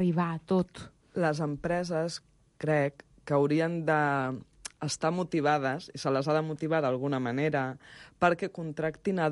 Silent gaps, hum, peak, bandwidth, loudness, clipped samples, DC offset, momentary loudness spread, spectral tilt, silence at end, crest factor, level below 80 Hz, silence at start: none; none; -12 dBFS; 11.5 kHz; -30 LUFS; under 0.1%; under 0.1%; 10 LU; -6 dB/octave; 0 s; 18 dB; -62 dBFS; 0 s